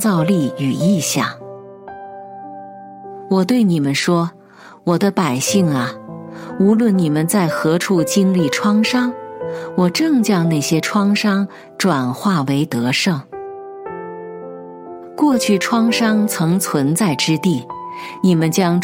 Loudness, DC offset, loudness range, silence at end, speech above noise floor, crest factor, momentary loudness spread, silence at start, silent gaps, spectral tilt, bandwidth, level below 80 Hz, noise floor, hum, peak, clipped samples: -16 LUFS; under 0.1%; 4 LU; 0 s; 27 dB; 16 dB; 19 LU; 0 s; none; -5 dB/octave; 16.5 kHz; -64 dBFS; -42 dBFS; none; -2 dBFS; under 0.1%